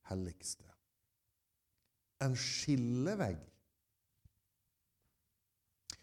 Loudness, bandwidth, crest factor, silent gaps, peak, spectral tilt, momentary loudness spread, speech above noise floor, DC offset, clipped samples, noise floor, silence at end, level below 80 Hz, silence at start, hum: -38 LUFS; 15 kHz; 18 dB; none; -24 dBFS; -5 dB/octave; 14 LU; 47 dB; under 0.1%; under 0.1%; -85 dBFS; 0.05 s; -66 dBFS; 0.05 s; none